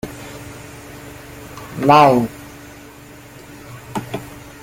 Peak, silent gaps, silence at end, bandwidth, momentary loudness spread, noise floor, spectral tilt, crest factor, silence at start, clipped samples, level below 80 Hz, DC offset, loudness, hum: 0 dBFS; none; 0.25 s; 17 kHz; 28 LU; -40 dBFS; -6 dB/octave; 20 dB; 0.05 s; under 0.1%; -48 dBFS; under 0.1%; -15 LUFS; none